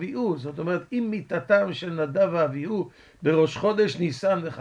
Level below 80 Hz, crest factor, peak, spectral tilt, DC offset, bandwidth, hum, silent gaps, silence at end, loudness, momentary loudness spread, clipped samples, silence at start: -64 dBFS; 18 dB; -8 dBFS; -7 dB/octave; under 0.1%; 10 kHz; none; none; 0 s; -25 LUFS; 8 LU; under 0.1%; 0 s